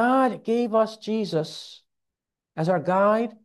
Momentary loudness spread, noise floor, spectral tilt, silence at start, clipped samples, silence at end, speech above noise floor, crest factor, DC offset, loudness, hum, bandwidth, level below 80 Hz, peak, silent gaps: 16 LU; -86 dBFS; -6.5 dB/octave; 0 s; under 0.1%; 0.15 s; 62 dB; 16 dB; under 0.1%; -24 LUFS; none; 12.5 kHz; -74 dBFS; -8 dBFS; none